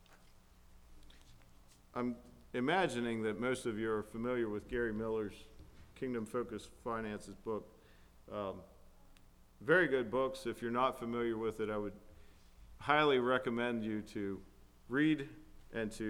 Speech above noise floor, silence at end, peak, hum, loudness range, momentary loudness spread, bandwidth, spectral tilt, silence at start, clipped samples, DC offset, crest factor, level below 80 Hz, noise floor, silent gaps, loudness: 25 dB; 0 s; -14 dBFS; none; 8 LU; 15 LU; 16.5 kHz; -5.5 dB/octave; 0.1 s; under 0.1%; under 0.1%; 24 dB; -60 dBFS; -62 dBFS; none; -37 LUFS